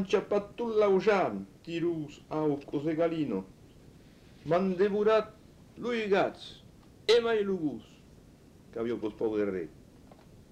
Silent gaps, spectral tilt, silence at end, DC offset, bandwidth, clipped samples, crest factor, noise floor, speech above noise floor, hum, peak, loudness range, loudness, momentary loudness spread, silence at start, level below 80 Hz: none; -6 dB/octave; 0.8 s; under 0.1%; 10.5 kHz; under 0.1%; 18 dB; -56 dBFS; 26 dB; none; -14 dBFS; 4 LU; -30 LUFS; 16 LU; 0 s; -62 dBFS